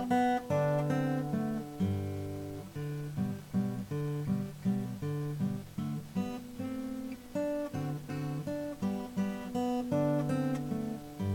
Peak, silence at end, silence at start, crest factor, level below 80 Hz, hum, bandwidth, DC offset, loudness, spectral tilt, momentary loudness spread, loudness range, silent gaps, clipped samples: -18 dBFS; 0 s; 0 s; 16 dB; -60 dBFS; none; 17.5 kHz; under 0.1%; -35 LUFS; -7.5 dB/octave; 9 LU; 3 LU; none; under 0.1%